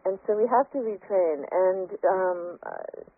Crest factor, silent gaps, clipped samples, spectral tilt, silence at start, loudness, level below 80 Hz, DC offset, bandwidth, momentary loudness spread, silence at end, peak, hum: 16 dB; none; under 0.1%; 0 dB/octave; 0.05 s; -26 LUFS; -76 dBFS; under 0.1%; 2.5 kHz; 13 LU; 0.15 s; -12 dBFS; none